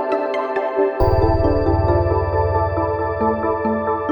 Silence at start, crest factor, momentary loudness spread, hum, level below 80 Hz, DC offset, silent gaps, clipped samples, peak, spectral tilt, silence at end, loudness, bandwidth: 0 s; 14 dB; 4 LU; none; -28 dBFS; under 0.1%; none; under 0.1%; -4 dBFS; -10 dB/octave; 0 s; -19 LUFS; 17.5 kHz